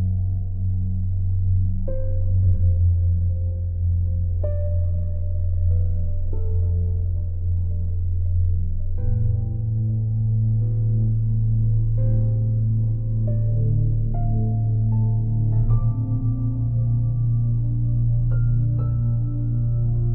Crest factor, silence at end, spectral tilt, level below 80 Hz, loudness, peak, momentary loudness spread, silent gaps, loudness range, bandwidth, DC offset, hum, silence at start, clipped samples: 12 dB; 0 s; -16 dB/octave; -26 dBFS; -23 LUFS; -8 dBFS; 5 LU; none; 3 LU; 1.5 kHz; under 0.1%; none; 0 s; under 0.1%